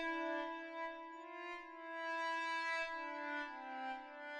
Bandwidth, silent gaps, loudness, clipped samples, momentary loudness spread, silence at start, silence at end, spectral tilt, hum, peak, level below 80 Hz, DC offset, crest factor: 11 kHz; none; -43 LUFS; under 0.1%; 10 LU; 0 s; 0 s; -1.5 dB/octave; none; -30 dBFS; -80 dBFS; under 0.1%; 14 dB